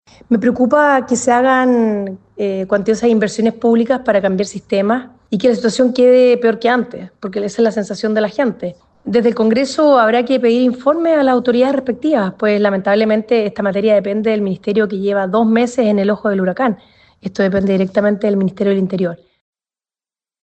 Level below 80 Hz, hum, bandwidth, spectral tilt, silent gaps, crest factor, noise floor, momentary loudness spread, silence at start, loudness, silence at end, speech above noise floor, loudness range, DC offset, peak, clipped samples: -56 dBFS; none; 8.8 kHz; -6 dB/octave; none; 12 dB; under -90 dBFS; 8 LU; 0.3 s; -15 LUFS; 1.3 s; over 76 dB; 3 LU; under 0.1%; -2 dBFS; under 0.1%